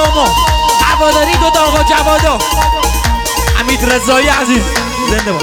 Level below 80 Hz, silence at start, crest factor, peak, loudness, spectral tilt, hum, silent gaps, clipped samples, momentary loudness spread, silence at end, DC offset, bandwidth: -18 dBFS; 0 s; 10 dB; 0 dBFS; -10 LUFS; -3.5 dB/octave; none; none; under 0.1%; 4 LU; 0 s; under 0.1%; 19 kHz